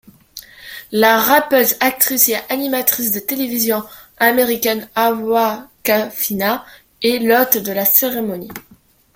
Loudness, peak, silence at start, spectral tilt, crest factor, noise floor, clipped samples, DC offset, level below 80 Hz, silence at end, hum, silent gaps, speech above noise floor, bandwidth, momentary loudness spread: -15 LUFS; 0 dBFS; 0.35 s; -2.5 dB/octave; 18 dB; -39 dBFS; under 0.1%; under 0.1%; -56 dBFS; 0.55 s; none; none; 23 dB; 17 kHz; 19 LU